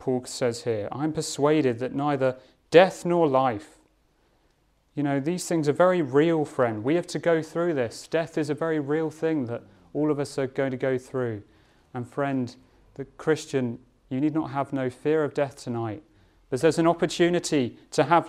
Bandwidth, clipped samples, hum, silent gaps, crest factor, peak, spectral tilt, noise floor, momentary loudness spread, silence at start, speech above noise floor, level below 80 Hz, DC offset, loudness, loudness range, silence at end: 14 kHz; under 0.1%; none; none; 22 dB; -2 dBFS; -6 dB/octave; -66 dBFS; 12 LU; 0 s; 41 dB; -64 dBFS; under 0.1%; -25 LUFS; 6 LU; 0 s